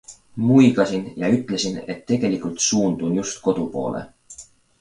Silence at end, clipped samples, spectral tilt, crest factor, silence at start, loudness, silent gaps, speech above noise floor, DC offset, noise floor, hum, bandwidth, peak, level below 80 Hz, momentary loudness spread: 0.35 s; under 0.1%; -5 dB/octave; 18 dB; 0.1 s; -21 LUFS; none; 25 dB; under 0.1%; -45 dBFS; none; 11 kHz; -2 dBFS; -56 dBFS; 20 LU